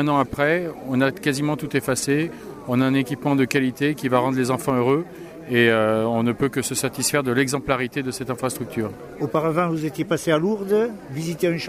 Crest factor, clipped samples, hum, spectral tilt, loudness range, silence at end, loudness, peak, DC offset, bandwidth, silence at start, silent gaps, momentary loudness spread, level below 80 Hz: 18 dB; under 0.1%; none; -5 dB/octave; 3 LU; 0 s; -22 LUFS; -4 dBFS; under 0.1%; 16 kHz; 0 s; none; 7 LU; -54 dBFS